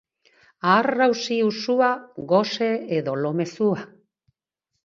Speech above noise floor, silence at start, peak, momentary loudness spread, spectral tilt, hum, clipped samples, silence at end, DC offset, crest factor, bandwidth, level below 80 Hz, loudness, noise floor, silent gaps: 59 dB; 0.65 s; -2 dBFS; 7 LU; -5.5 dB/octave; none; under 0.1%; 1 s; under 0.1%; 20 dB; 7.6 kHz; -70 dBFS; -22 LUFS; -80 dBFS; none